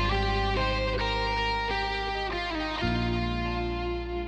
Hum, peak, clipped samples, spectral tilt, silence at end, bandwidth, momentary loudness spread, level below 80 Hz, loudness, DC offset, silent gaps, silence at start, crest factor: none; -14 dBFS; under 0.1%; -6 dB/octave; 0 s; 8.6 kHz; 4 LU; -34 dBFS; -29 LUFS; under 0.1%; none; 0 s; 14 dB